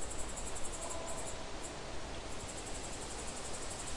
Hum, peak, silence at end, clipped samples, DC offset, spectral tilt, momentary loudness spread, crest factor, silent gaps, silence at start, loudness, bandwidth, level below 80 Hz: none; -24 dBFS; 0 s; under 0.1%; 0.2%; -2.5 dB/octave; 3 LU; 16 dB; none; 0 s; -43 LUFS; 11.5 kHz; -50 dBFS